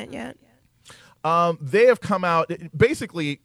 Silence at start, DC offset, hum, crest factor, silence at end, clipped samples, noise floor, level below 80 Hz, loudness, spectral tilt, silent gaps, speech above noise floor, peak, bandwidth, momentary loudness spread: 0 s; under 0.1%; none; 18 dB; 0.1 s; under 0.1%; -52 dBFS; -54 dBFS; -21 LUFS; -6 dB/octave; none; 30 dB; -4 dBFS; 13.5 kHz; 15 LU